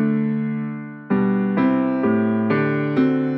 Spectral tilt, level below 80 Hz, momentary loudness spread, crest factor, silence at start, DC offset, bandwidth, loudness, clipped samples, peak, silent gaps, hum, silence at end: -10.5 dB/octave; -64 dBFS; 7 LU; 14 dB; 0 s; under 0.1%; 5.2 kHz; -20 LUFS; under 0.1%; -6 dBFS; none; none; 0 s